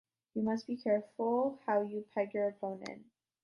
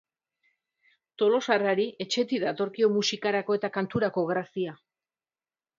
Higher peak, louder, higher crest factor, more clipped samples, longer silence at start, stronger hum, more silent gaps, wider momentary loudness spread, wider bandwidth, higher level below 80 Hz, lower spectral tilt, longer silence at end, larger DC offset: second, -20 dBFS vs -8 dBFS; second, -35 LUFS vs -27 LUFS; second, 16 dB vs 22 dB; neither; second, 0.35 s vs 1.2 s; neither; neither; first, 11 LU vs 6 LU; about the same, 7.2 kHz vs 7.6 kHz; second, -80 dBFS vs -72 dBFS; first, -7 dB/octave vs -4.5 dB/octave; second, 0.4 s vs 1.05 s; neither